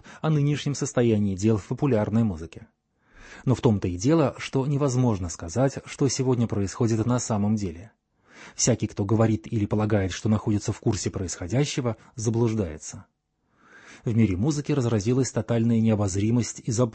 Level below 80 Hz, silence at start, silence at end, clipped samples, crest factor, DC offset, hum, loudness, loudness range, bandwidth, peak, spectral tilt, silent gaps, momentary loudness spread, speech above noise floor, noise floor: -52 dBFS; 0.05 s; 0 s; under 0.1%; 18 dB; under 0.1%; none; -25 LUFS; 3 LU; 8.8 kHz; -8 dBFS; -6 dB/octave; none; 8 LU; 44 dB; -68 dBFS